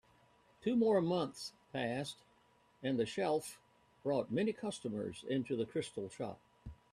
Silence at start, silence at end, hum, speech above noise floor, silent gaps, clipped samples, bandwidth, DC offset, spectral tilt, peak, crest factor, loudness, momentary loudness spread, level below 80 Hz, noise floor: 0.6 s; 0.2 s; none; 33 dB; none; under 0.1%; 14 kHz; under 0.1%; -5.5 dB/octave; -20 dBFS; 18 dB; -38 LUFS; 15 LU; -70 dBFS; -70 dBFS